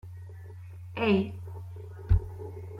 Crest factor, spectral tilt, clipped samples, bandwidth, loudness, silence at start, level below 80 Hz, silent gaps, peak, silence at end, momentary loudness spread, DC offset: 20 dB; -8.5 dB/octave; under 0.1%; 5.6 kHz; -30 LUFS; 0.05 s; -38 dBFS; none; -12 dBFS; 0 s; 19 LU; under 0.1%